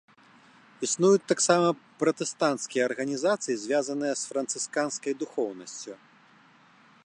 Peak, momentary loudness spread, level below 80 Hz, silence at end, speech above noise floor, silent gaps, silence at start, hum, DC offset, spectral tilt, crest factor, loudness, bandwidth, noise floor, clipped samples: -8 dBFS; 11 LU; -80 dBFS; 1.1 s; 31 dB; none; 0.8 s; none; under 0.1%; -3.5 dB/octave; 20 dB; -27 LUFS; 11 kHz; -58 dBFS; under 0.1%